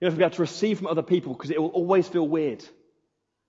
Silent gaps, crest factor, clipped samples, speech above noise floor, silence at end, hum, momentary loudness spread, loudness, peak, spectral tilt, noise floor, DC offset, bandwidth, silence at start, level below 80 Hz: none; 18 dB; under 0.1%; 52 dB; 0.8 s; none; 6 LU; -25 LUFS; -6 dBFS; -6.5 dB/octave; -76 dBFS; under 0.1%; 7.8 kHz; 0 s; -74 dBFS